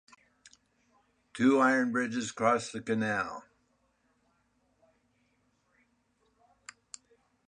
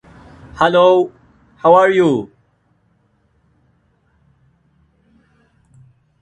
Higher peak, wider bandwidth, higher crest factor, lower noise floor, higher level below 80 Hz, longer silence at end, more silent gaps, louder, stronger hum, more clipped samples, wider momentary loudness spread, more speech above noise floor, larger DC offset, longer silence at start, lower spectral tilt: second, -10 dBFS vs 0 dBFS; first, 10.5 kHz vs 9.2 kHz; first, 24 dB vs 18 dB; first, -73 dBFS vs -60 dBFS; second, -74 dBFS vs -54 dBFS; about the same, 4.05 s vs 3.95 s; neither; second, -29 LUFS vs -13 LUFS; neither; neither; first, 25 LU vs 16 LU; about the same, 45 dB vs 48 dB; neither; first, 1.35 s vs 0.55 s; second, -5 dB/octave vs -6.5 dB/octave